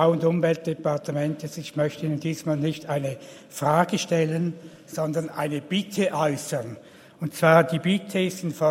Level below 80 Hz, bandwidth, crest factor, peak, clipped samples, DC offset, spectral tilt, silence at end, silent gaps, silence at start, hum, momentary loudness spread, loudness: -68 dBFS; 16 kHz; 22 dB; -2 dBFS; under 0.1%; under 0.1%; -6 dB/octave; 0 s; none; 0 s; none; 12 LU; -25 LUFS